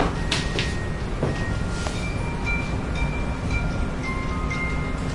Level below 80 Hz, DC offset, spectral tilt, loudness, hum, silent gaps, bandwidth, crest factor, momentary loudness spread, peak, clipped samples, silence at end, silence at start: -30 dBFS; under 0.1%; -5.5 dB/octave; -26 LUFS; none; none; 11.5 kHz; 20 dB; 3 LU; -6 dBFS; under 0.1%; 0 s; 0 s